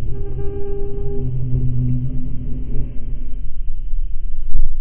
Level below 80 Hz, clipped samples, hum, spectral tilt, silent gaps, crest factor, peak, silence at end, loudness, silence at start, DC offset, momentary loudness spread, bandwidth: -20 dBFS; under 0.1%; none; -14 dB/octave; none; 12 dB; 0 dBFS; 0 s; -26 LUFS; 0 s; under 0.1%; 10 LU; 0.9 kHz